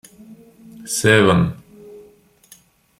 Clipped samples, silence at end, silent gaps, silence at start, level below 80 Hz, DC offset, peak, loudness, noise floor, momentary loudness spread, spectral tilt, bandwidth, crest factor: under 0.1%; 1 s; none; 0.3 s; -52 dBFS; under 0.1%; -2 dBFS; -16 LUFS; -51 dBFS; 25 LU; -4.5 dB/octave; 16 kHz; 20 dB